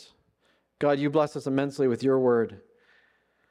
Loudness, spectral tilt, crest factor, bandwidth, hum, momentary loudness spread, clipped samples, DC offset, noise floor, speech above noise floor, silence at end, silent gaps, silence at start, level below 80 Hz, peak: -26 LUFS; -7 dB/octave; 18 dB; 11 kHz; none; 5 LU; under 0.1%; under 0.1%; -69 dBFS; 45 dB; 0.95 s; none; 0.8 s; -74 dBFS; -10 dBFS